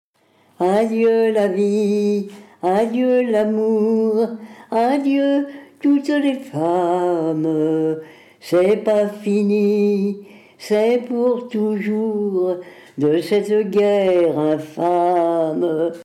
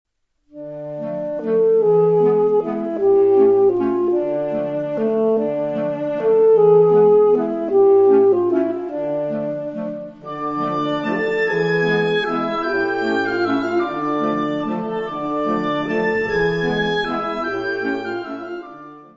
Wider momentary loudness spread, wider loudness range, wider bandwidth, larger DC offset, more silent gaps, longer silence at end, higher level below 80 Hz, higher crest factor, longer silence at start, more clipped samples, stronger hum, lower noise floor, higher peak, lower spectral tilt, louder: second, 7 LU vs 14 LU; second, 2 LU vs 6 LU; first, 13.5 kHz vs 7 kHz; neither; neither; second, 0 s vs 0.15 s; second, -68 dBFS vs -52 dBFS; about the same, 10 dB vs 14 dB; about the same, 0.6 s vs 0.55 s; neither; neither; about the same, -57 dBFS vs -54 dBFS; second, -8 dBFS vs -4 dBFS; about the same, -7 dB/octave vs -7.5 dB/octave; about the same, -18 LUFS vs -18 LUFS